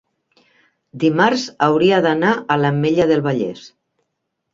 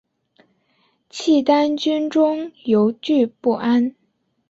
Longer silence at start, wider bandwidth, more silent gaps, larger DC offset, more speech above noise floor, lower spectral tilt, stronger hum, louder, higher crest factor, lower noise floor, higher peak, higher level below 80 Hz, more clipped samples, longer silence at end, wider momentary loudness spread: second, 0.95 s vs 1.15 s; about the same, 7.6 kHz vs 8 kHz; neither; neither; first, 59 dB vs 46 dB; about the same, -6.5 dB/octave vs -5.5 dB/octave; neither; about the same, -17 LUFS vs -19 LUFS; about the same, 16 dB vs 16 dB; first, -75 dBFS vs -64 dBFS; about the same, -2 dBFS vs -4 dBFS; first, -58 dBFS vs -66 dBFS; neither; first, 0.85 s vs 0.6 s; about the same, 7 LU vs 9 LU